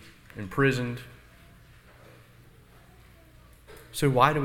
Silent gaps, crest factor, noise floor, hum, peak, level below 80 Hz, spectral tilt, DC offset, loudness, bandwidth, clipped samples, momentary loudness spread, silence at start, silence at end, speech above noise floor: none; 24 dB; -54 dBFS; 60 Hz at -55 dBFS; -6 dBFS; -54 dBFS; -6 dB/octave; under 0.1%; -26 LUFS; 17 kHz; under 0.1%; 27 LU; 0.05 s; 0 s; 29 dB